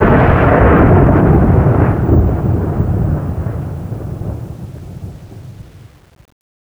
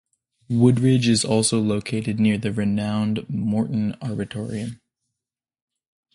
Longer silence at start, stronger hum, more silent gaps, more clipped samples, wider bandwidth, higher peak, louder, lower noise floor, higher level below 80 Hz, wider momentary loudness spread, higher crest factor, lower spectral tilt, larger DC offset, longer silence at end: second, 0 s vs 0.5 s; neither; neither; neither; first, over 20 kHz vs 11.5 kHz; first, 0 dBFS vs -4 dBFS; first, -12 LUFS vs -22 LUFS; second, -39 dBFS vs -87 dBFS; first, -20 dBFS vs -54 dBFS; first, 21 LU vs 11 LU; second, 12 dB vs 18 dB; first, -10 dB/octave vs -5.5 dB/octave; neither; second, 0.95 s vs 1.4 s